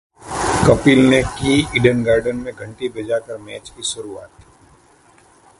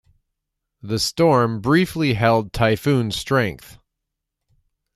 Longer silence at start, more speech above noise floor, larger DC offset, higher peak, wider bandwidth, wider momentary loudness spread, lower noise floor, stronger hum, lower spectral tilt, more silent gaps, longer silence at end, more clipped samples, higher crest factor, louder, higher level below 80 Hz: second, 0.2 s vs 0.85 s; second, 34 dB vs 62 dB; neither; first, 0 dBFS vs -4 dBFS; second, 11.5 kHz vs 15 kHz; first, 19 LU vs 7 LU; second, -51 dBFS vs -81 dBFS; neither; about the same, -5 dB/octave vs -5.5 dB/octave; neither; about the same, 1.35 s vs 1.25 s; neither; about the same, 18 dB vs 18 dB; about the same, -17 LUFS vs -19 LUFS; first, -38 dBFS vs -46 dBFS